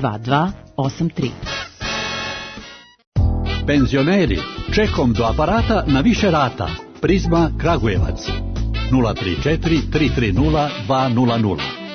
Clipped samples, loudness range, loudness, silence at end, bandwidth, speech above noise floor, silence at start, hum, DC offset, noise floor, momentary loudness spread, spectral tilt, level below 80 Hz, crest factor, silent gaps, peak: under 0.1%; 5 LU; -19 LUFS; 0 s; 6.6 kHz; 21 dB; 0 s; none; under 0.1%; -38 dBFS; 9 LU; -6.5 dB/octave; -28 dBFS; 14 dB; 3.07-3.12 s; -4 dBFS